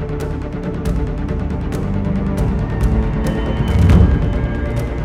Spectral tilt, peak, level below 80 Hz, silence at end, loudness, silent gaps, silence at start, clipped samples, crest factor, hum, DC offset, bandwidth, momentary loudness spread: -8 dB/octave; 0 dBFS; -20 dBFS; 0 s; -18 LUFS; none; 0 s; under 0.1%; 16 dB; none; under 0.1%; 13 kHz; 10 LU